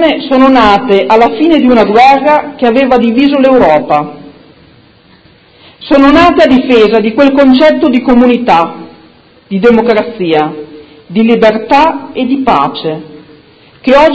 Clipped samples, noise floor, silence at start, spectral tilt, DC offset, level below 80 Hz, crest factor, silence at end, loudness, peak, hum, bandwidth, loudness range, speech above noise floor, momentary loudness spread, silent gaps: 3%; -41 dBFS; 0 s; -6.5 dB/octave; under 0.1%; -38 dBFS; 8 dB; 0 s; -7 LUFS; 0 dBFS; none; 8 kHz; 4 LU; 35 dB; 12 LU; none